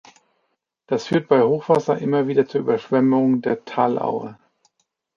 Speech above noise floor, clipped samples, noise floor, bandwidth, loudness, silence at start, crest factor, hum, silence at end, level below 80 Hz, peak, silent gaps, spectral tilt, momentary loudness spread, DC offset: 54 dB; under 0.1%; -73 dBFS; 7.4 kHz; -20 LUFS; 0.9 s; 18 dB; none; 0.85 s; -66 dBFS; -2 dBFS; none; -7.5 dB/octave; 9 LU; under 0.1%